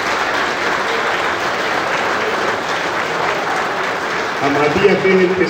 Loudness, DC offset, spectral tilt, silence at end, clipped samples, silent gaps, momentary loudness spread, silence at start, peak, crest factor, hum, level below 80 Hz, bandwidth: -16 LUFS; under 0.1%; -4 dB/octave; 0 s; under 0.1%; none; 5 LU; 0 s; 0 dBFS; 16 dB; none; -50 dBFS; 16.5 kHz